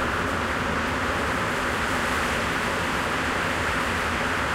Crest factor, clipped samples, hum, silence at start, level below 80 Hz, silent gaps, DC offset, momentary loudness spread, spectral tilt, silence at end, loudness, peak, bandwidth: 14 dB; under 0.1%; none; 0 s; -40 dBFS; none; under 0.1%; 1 LU; -4 dB/octave; 0 s; -24 LUFS; -12 dBFS; 16 kHz